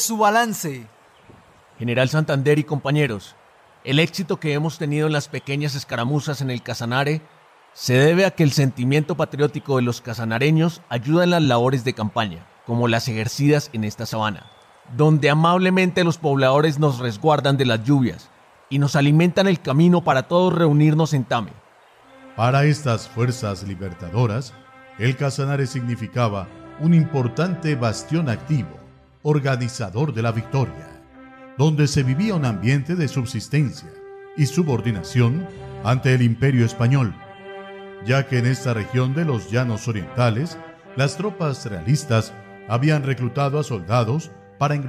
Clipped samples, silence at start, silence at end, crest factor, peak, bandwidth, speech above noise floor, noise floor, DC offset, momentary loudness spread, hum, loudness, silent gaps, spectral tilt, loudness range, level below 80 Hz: under 0.1%; 0 s; 0 s; 16 dB; -6 dBFS; 15 kHz; 32 dB; -51 dBFS; under 0.1%; 11 LU; none; -20 LUFS; none; -6 dB/octave; 5 LU; -50 dBFS